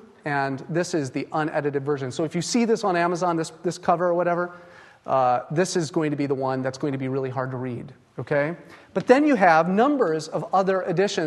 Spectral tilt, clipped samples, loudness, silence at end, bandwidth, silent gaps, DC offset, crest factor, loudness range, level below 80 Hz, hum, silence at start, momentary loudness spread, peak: -5.5 dB/octave; under 0.1%; -23 LUFS; 0 s; 12.5 kHz; none; under 0.1%; 20 dB; 5 LU; -68 dBFS; none; 0.25 s; 11 LU; -2 dBFS